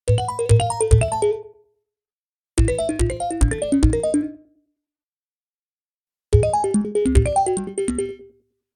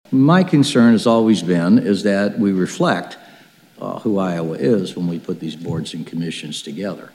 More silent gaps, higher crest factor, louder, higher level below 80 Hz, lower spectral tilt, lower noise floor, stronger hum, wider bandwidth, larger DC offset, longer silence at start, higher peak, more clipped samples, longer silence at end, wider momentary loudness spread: first, 2.13-2.44 s, 5.03-6.06 s vs none; about the same, 20 dB vs 16 dB; about the same, -20 LUFS vs -18 LUFS; first, -26 dBFS vs -64 dBFS; about the same, -6.5 dB/octave vs -6.5 dB/octave; first, under -90 dBFS vs -47 dBFS; neither; about the same, 11.5 kHz vs 12.5 kHz; neither; about the same, 0.05 s vs 0.1 s; about the same, -2 dBFS vs -2 dBFS; neither; first, 0.5 s vs 0.05 s; second, 8 LU vs 14 LU